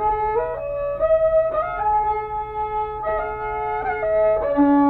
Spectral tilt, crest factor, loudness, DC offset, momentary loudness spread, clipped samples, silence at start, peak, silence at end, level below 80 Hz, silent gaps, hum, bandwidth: -9.5 dB/octave; 12 dB; -21 LUFS; under 0.1%; 8 LU; under 0.1%; 0 s; -8 dBFS; 0 s; -40 dBFS; none; none; 4.2 kHz